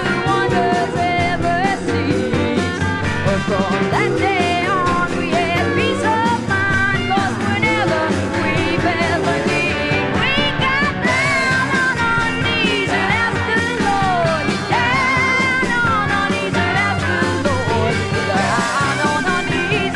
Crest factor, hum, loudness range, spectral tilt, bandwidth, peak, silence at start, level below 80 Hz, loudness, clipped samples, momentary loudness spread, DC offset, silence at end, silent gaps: 14 dB; none; 2 LU; -5 dB/octave; 12 kHz; -2 dBFS; 0 s; -40 dBFS; -17 LUFS; under 0.1%; 3 LU; under 0.1%; 0 s; none